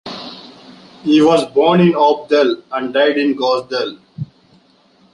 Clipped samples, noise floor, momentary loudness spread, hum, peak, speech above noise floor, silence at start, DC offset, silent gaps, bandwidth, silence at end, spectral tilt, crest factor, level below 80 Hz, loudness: under 0.1%; -52 dBFS; 20 LU; none; -2 dBFS; 39 dB; 0.05 s; under 0.1%; none; 11.5 kHz; 0.9 s; -6.5 dB/octave; 14 dB; -58 dBFS; -14 LUFS